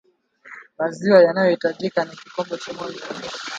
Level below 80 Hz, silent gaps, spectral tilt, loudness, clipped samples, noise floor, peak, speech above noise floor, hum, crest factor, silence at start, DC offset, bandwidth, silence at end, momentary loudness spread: -68 dBFS; none; -5.5 dB/octave; -21 LUFS; under 0.1%; -48 dBFS; 0 dBFS; 28 dB; none; 20 dB; 0.45 s; under 0.1%; 8 kHz; 0 s; 18 LU